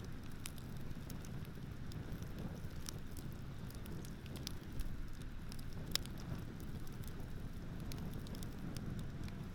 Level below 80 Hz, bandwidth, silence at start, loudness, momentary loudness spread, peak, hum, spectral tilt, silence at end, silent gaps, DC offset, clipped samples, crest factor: -50 dBFS; 18 kHz; 0 s; -48 LUFS; 4 LU; -12 dBFS; none; -5 dB/octave; 0 s; none; under 0.1%; under 0.1%; 32 dB